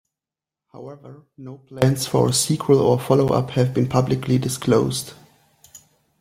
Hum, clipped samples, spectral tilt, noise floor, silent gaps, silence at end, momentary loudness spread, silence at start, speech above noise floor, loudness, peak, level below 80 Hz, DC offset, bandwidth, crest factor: none; under 0.1%; -5.5 dB/octave; -89 dBFS; none; 0.45 s; 22 LU; 0.75 s; 69 dB; -19 LUFS; -2 dBFS; -52 dBFS; under 0.1%; 16.5 kHz; 18 dB